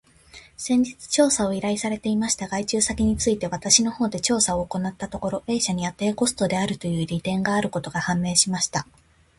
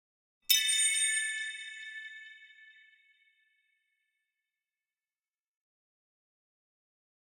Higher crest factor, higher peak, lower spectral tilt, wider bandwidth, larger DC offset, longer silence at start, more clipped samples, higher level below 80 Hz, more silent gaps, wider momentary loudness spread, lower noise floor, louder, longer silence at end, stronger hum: second, 22 dB vs 28 dB; first, -2 dBFS vs -10 dBFS; first, -3.5 dB/octave vs 6.5 dB/octave; second, 11.5 kHz vs 16.5 kHz; neither; second, 0.35 s vs 0.5 s; neither; first, -46 dBFS vs -86 dBFS; neither; second, 8 LU vs 23 LU; second, -49 dBFS vs under -90 dBFS; first, -23 LUFS vs -27 LUFS; second, 0.55 s vs 4.5 s; neither